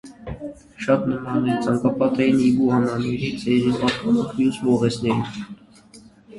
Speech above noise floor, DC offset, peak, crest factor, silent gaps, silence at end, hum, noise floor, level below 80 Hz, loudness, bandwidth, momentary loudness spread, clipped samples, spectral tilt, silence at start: 28 dB; under 0.1%; -4 dBFS; 18 dB; none; 0 s; none; -48 dBFS; -50 dBFS; -21 LUFS; 11.5 kHz; 16 LU; under 0.1%; -7 dB/octave; 0.05 s